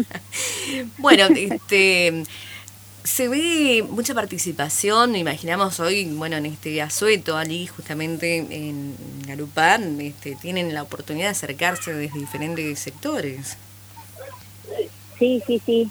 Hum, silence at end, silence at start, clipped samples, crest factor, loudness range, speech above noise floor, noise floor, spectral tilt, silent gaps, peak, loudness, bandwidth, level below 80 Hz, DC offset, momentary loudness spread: 50 Hz at -45 dBFS; 0 s; 0 s; under 0.1%; 22 dB; 8 LU; 21 dB; -43 dBFS; -3 dB/octave; none; 0 dBFS; -21 LUFS; over 20 kHz; -62 dBFS; under 0.1%; 17 LU